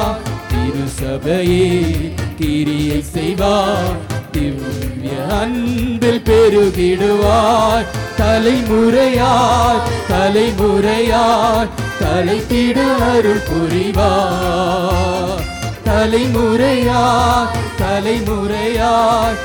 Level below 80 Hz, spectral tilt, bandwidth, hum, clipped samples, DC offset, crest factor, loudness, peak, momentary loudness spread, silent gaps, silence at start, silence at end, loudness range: -28 dBFS; -5.5 dB/octave; 19 kHz; none; under 0.1%; under 0.1%; 10 dB; -15 LUFS; -4 dBFS; 8 LU; none; 0 s; 0 s; 4 LU